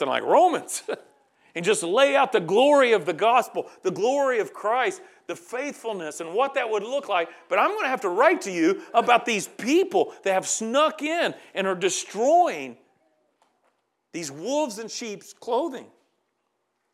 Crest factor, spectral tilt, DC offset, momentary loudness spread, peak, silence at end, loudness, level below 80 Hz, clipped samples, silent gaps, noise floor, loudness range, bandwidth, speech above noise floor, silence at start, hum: 20 dB; -3 dB/octave; under 0.1%; 14 LU; -4 dBFS; 1.1 s; -23 LUFS; under -90 dBFS; under 0.1%; none; -75 dBFS; 10 LU; 15 kHz; 52 dB; 0 s; none